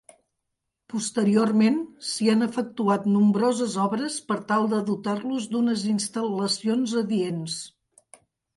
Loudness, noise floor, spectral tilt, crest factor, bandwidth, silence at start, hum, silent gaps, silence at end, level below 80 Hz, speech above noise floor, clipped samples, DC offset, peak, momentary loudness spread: -24 LUFS; -81 dBFS; -5 dB/octave; 16 dB; 11.5 kHz; 0.95 s; none; none; 0.85 s; -70 dBFS; 58 dB; under 0.1%; under 0.1%; -8 dBFS; 9 LU